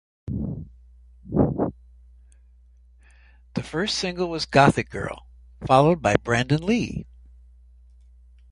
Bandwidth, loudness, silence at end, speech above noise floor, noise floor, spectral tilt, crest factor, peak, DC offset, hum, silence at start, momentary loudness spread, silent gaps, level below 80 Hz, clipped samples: 11 kHz; -23 LUFS; 1.45 s; 31 dB; -53 dBFS; -5.5 dB/octave; 24 dB; 0 dBFS; under 0.1%; none; 0.25 s; 16 LU; none; -44 dBFS; under 0.1%